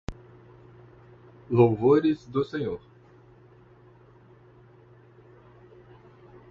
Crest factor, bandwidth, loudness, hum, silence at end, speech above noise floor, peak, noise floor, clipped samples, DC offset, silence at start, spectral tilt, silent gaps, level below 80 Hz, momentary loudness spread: 24 dB; 7.2 kHz; -24 LUFS; 60 Hz at -55 dBFS; 3.75 s; 31 dB; -6 dBFS; -54 dBFS; under 0.1%; under 0.1%; 0.1 s; -9 dB/octave; none; -54 dBFS; 16 LU